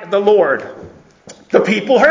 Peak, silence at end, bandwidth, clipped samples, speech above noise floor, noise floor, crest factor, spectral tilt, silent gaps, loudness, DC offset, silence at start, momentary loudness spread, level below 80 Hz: 0 dBFS; 0 s; 7.6 kHz; under 0.1%; 29 dB; -41 dBFS; 14 dB; -5.5 dB/octave; none; -14 LUFS; under 0.1%; 0 s; 9 LU; -54 dBFS